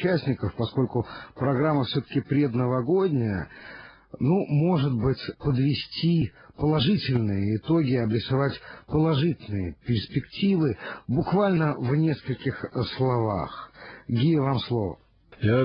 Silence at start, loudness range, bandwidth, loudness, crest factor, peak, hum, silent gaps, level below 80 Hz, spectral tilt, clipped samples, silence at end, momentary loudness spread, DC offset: 0 s; 2 LU; 5.4 kHz; -25 LUFS; 14 dB; -12 dBFS; none; none; -50 dBFS; -11 dB/octave; under 0.1%; 0 s; 9 LU; under 0.1%